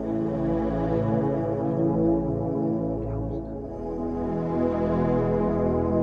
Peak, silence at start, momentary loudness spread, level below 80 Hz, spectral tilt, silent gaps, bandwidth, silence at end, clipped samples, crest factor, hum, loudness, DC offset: -12 dBFS; 0 s; 7 LU; -40 dBFS; -11 dB/octave; none; 5.2 kHz; 0 s; under 0.1%; 14 dB; none; -26 LUFS; under 0.1%